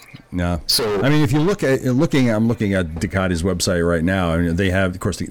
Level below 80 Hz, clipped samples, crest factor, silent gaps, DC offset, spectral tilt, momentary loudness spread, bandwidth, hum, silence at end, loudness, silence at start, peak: -36 dBFS; under 0.1%; 14 dB; none; under 0.1%; -5.5 dB/octave; 6 LU; 19.5 kHz; none; 0 s; -19 LUFS; 0 s; -4 dBFS